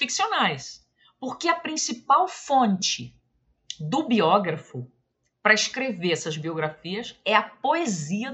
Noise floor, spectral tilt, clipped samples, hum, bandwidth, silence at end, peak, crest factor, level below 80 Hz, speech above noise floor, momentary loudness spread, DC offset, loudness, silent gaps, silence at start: -72 dBFS; -3.5 dB/octave; under 0.1%; none; 8.4 kHz; 0 s; -4 dBFS; 22 dB; -70 dBFS; 48 dB; 15 LU; under 0.1%; -24 LUFS; none; 0 s